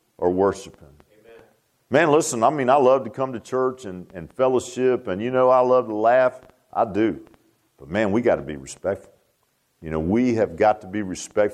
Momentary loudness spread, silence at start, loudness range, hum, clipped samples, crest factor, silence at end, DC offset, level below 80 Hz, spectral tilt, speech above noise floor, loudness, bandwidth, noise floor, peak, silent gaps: 13 LU; 0.2 s; 5 LU; none; under 0.1%; 18 dB; 0 s; under 0.1%; -54 dBFS; -5.5 dB/octave; 47 dB; -21 LUFS; 13.5 kHz; -68 dBFS; -4 dBFS; none